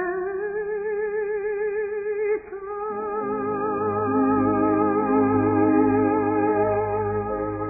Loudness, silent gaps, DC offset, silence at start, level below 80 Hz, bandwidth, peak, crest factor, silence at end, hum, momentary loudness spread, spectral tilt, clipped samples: -23 LUFS; none; under 0.1%; 0 s; -50 dBFS; 2.7 kHz; -8 dBFS; 14 dB; 0 s; none; 8 LU; -14.5 dB/octave; under 0.1%